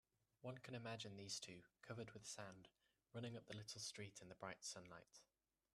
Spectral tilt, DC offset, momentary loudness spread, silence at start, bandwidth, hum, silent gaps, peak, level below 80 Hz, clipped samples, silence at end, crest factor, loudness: -3.5 dB/octave; under 0.1%; 11 LU; 0.4 s; 13 kHz; none; none; -36 dBFS; -86 dBFS; under 0.1%; 0.5 s; 20 dB; -55 LUFS